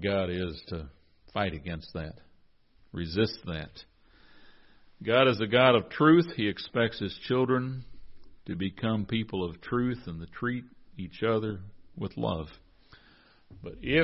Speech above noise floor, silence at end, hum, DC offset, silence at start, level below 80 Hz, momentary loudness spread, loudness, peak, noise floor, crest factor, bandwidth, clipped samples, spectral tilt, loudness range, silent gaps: 32 dB; 0 s; none; under 0.1%; 0 s; -52 dBFS; 20 LU; -29 LUFS; -8 dBFS; -61 dBFS; 22 dB; 5.8 kHz; under 0.1%; -9.5 dB/octave; 10 LU; none